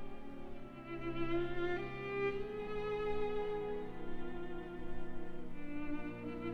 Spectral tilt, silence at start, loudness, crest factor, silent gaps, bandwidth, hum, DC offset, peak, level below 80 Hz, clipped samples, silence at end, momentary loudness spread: -7.5 dB/octave; 0 s; -42 LUFS; 12 dB; none; 5 kHz; none; 0.1%; -26 dBFS; -50 dBFS; under 0.1%; 0 s; 11 LU